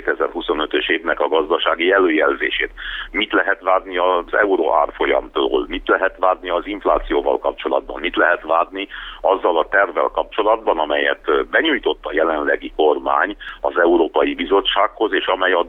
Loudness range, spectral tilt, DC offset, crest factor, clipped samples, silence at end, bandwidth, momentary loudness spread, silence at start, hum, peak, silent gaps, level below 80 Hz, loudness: 2 LU; -6 dB/octave; under 0.1%; 16 dB; under 0.1%; 0 s; 4.1 kHz; 6 LU; 0 s; none; -2 dBFS; none; -42 dBFS; -18 LUFS